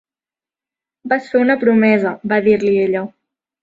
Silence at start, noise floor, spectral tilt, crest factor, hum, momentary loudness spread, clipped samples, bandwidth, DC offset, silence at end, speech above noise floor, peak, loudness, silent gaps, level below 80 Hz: 1.05 s; under -90 dBFS; -8 dB/octave; 16 dB; none; 9 LU; under 0.1%; 7.6 kHz; under 0.1%; 0.55 s; over 76 dB; -2 dBFS; -15 LUFS; none; -58 dBFS